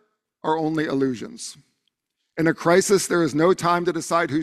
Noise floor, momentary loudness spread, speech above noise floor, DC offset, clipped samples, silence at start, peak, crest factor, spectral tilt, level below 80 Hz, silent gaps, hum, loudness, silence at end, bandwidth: -75 dBFS; 15 LU; 54 dB; under 0.1%; under 0.1%; 0.45 s; -4 dBFS; 18 dB; -5 dB/octave; -62 dBFS; none; none; -21 LUFS; 0 s; 14 kHz